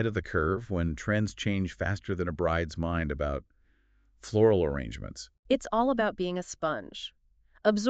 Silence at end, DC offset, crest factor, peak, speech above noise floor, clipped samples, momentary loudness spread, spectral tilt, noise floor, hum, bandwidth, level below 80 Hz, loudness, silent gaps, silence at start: 0 s; under 0.1%; 20 dB; -10 dBFS; 37 dB; under 0.1%; 14 LU; -6 dB/octave; -66 dBFS; none; 8.8 kHz; -44 dBFS; -30 LUFS; 5.39-5.43 s; 0 s